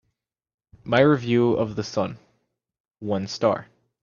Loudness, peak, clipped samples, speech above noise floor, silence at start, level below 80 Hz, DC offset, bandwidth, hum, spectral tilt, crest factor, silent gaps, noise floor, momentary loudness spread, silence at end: -23 LUFS; -4 dBFS; under 0.1%; 56 dB; 0.85 s; -60 dBFS; under 0.1%; 7.2 kHz; none; -6.5 dB/octave; 22 dB; 2.80-2.84 s; -78 dBFS; 12 LU; 0.4 s